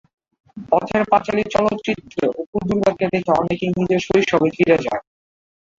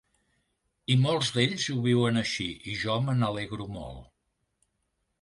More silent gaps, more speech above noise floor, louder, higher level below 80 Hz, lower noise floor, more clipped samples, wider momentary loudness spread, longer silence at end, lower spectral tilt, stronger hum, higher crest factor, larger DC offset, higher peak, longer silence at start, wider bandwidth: first, 2.47-2.53 s vs none; first, over 72 dB vs 51 dB; first, -19 LUFS vs -27 LUFS; first, -50 dBFS vs -56 dBFS; first, under -90 dBFS vs -78 dBFS; neither; second, 8 LU vs 14 LU; second, 0.8 s vs 1.2 s; about the same, -6.5 dB/octave vs -5.5 dB/octave; neither; about the same, 18 dB vs 20 dB; neither; first, -2 dBFS vs -10 dBFS; second, 0.55 s vs 0.9 s; second, 7.8 kHz vs 11.5 kHz